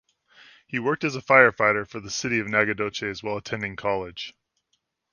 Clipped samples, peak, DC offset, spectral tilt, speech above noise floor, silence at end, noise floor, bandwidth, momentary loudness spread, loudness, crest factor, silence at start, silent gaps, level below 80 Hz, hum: under 0.1%; 0 dBFS; under 0.1%; -4 dB/octave; 51 dB; 0.85 s; -75 dBFS; 10 kHz; 15 LU; -23 LUFS; 24 dB; 0.7 s; none; -60 dBFS; none